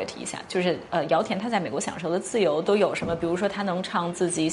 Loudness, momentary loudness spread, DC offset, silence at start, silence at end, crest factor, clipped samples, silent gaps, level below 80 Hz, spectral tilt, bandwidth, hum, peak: -26 LUFS; 6 LU; under 0.1%; 0 s; 0 s; 18 dB; under 0.1%; none; -58 dBFS; -4.5 dB/octave; 11.5 kHz; none; -8 dBFS